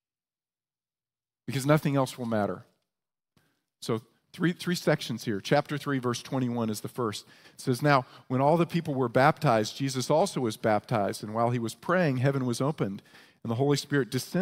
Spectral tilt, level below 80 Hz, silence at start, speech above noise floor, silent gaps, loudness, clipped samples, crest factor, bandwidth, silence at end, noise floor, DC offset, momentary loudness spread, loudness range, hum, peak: -6 dB/octave; -70 dBFS; 1.5 s; over 63 dB; none; -28 LUFS; under 0.1%; 22 dB; 16 kHz; 0 s; under -90 dBFS; under 0.1%; 9 LU; 5 LU; none; -6 dBFS